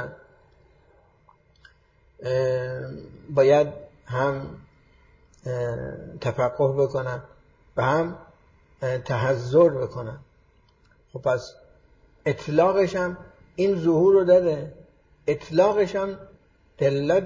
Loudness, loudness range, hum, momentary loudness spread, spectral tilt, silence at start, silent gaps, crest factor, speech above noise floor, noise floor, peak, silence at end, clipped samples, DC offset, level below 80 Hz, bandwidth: -23 LUFS; 6 LU; none; 19 LU; -7.5 dB/octave; 0 s; none; 18 dB; 37 dB; -60 dBFS; -6 dBFS; 0 s; under 0.1%; under 0.1%; -54 dBFS; 7.6 kHz